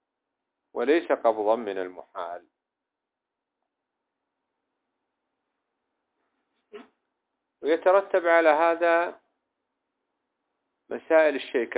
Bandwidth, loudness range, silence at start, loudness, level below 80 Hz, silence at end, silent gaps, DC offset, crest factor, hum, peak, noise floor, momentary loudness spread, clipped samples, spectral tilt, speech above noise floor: 4 kHz; 16 LU; 0.75 s; -23 LUFS; -82 dBFS; 0 s; none; under 0.1%; 20 dB; none; -8 dBFS; -86 dBFS; 17 LU; under 0.1%; -7 dB/octave; 63 dB